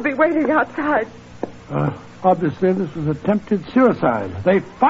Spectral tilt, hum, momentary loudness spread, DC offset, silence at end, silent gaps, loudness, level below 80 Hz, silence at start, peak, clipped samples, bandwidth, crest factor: -8.5 dB/octave; none; 10 LU; under 0.1%; 0 s; none; -19 LUFS; -50 dBFS; 0 s; -2 dBFS; under 0.1%; 7.8 kHz; 16 dB